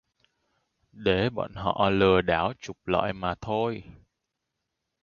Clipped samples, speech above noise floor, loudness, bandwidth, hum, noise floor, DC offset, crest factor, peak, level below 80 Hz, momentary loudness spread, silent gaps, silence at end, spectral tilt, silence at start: under 0.1%; 57 dB; -26 LUFS; 7.2 kHz; none; -83 dBFS; under 0.1%; 22 dB; -6 dBFS; -50 dBFS; 10 LU; none; 1.1 s; -6.5 dB/octave; 0.95 s